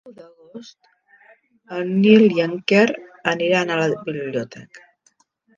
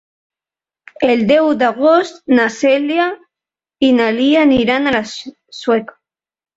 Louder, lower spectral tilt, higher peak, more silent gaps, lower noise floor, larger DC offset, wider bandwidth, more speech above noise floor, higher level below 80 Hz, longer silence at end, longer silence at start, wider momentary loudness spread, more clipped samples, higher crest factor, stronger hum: second, -18 LUFS vs -14 LUFS; about the same, -6 dB/octave vs -5 dB/octave; about the same, 0 dBFS vs 0 dBFS; neither; second, -62 dBFS vs -90 dBFS; neither; about the same, 7.4 kHz vs 7.8 kHz; second, 43 dB vs 76 dB; second, -68 dBFS vs -52 dBFS; about the same, 0.8 s vs 0.7 s; second, 0.05 s vs 1 s; first, 21 LU vs 10 LU; neither; first, 20 dB vs 14 dB; neither